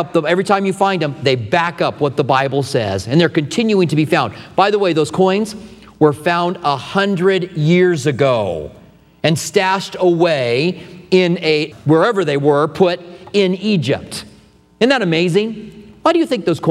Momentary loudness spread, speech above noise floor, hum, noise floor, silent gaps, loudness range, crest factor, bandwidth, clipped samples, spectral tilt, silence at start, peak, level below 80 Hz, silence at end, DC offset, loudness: 6 LU; 32 dB; none; -47 dBFS; none; 2 LU; 16 dB; 14 kHz; under 0.1%; -6 dB/octave; 0 s; 0 dBFS; -52 dBFS; 0 s; under 0.1%; -16 LUFS